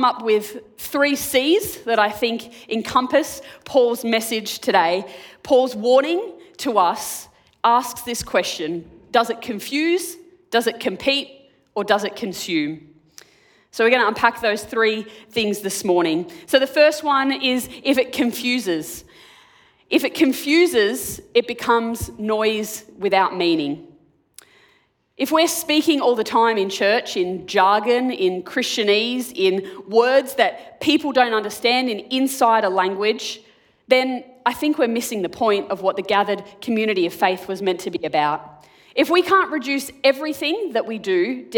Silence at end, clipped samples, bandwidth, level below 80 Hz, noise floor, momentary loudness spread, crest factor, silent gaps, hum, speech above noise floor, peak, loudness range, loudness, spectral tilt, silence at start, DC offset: 0 s; under 0.1%; 19 kHz; -58 dBFS; -61 dBFS; 10 LU; 20 dB; none; none; 41 dB; 0 dBFS; 3 LU; -20 LUFS; -3 dB/octave; 0 s; under 0.1%